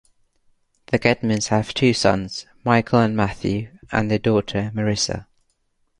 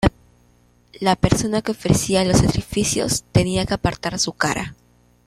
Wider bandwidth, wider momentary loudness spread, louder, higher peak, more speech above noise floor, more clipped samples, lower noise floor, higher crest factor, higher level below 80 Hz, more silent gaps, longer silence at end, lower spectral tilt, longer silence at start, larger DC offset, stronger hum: second, 11 kHz vs 14.5 kHz; about the same, 8 LU vs 6 LU; about the same, -21 LUFS vs -20 LUFS; about the same, 0 dBFS vs -2 dBFS; first, 47 dB vs 37 dB; neither; first, -67 dBFS vs -56 dBFS; about the same, 20 dB vs 18 dB; second, -46 dBFS vs -36 dBFS; neither; first, 0.75 s vs 0.55 s; about the same, -5 dB/octave vs -4.5 dB/octave; first, 0.9 s vs 0 s; neither; second, none vs 60 Hz at -40 dBFS